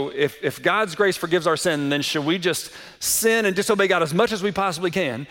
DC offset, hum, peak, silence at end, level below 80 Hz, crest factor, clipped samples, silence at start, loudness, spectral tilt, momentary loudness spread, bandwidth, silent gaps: under 0.1%; none; -6 dBFS; 0.05 s; -58 dBFS; 16 dB; under 0.1%; 0 s; -21 LUFS; -3.5 dB/octave; 5 LU; 17 kHz; none